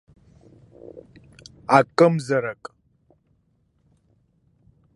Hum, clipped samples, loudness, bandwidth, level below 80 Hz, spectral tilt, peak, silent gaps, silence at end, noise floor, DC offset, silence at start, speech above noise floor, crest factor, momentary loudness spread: none; under 0.1%; -20 LUFS; 11.5 kHz; -64 dBFS; -6.5 dB/octave; -2 dBFS; none; 2.4 s; -66 dBFS; under 0.1%; 0.95 s; 47 dB; 24 dB; 27 LU